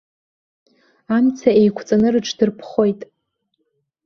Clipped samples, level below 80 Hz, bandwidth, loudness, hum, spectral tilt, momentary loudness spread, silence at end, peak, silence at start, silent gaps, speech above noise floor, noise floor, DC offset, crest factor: under 0.1%; -58 dBFS; 7 kHz; -17 LUFS; none; -6 dB/octave; 6 LU; 1 s; -2 dBFS; 1.1 s; none; 55 dB; -71 dBFS; under 0.1%; 18 dB